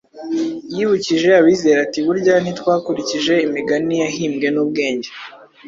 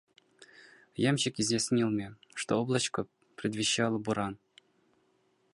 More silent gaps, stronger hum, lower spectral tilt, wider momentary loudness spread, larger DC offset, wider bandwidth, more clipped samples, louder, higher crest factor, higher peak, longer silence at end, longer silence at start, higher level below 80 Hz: neither; neither; about the same, -5 dB/octave vs -4 dB/octave; about the same, 11 LU vs 12 LU; neither; second, 7.6 kHz vs 11.5 kHz; neither; first, -17 LUFS vs -31 LUFS; about the same, 16 dB vs 18 dB; first, -2 dBFS vs -14 dBFS; second, 0 s vs 1.2 s; second, 0.15 s vs 1 s; first, -60 dBFS vs -68 dBFS